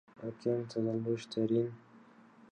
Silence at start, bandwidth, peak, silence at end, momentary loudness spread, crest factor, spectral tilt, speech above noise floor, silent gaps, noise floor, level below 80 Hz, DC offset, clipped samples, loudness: 0.2 s; 9.2 kHz; -20 dBFS; 0.55 s; 9 LU; 16 dB; -7.5 dB/octave; 25 dB; none; -59 dBFS; -76 dBFS; under 0.1%; under 0.1%; -35 LUFS